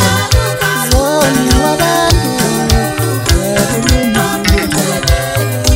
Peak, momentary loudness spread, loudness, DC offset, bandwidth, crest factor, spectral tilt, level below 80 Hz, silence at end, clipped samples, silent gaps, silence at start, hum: 0 dBFS; 3 LU; -12 LUFS; under 0.1%; 16.5 kHz; 12 dB; -4 dB/octave; -18 dBFS; 0 s; under 0.1%; none; 0 s; none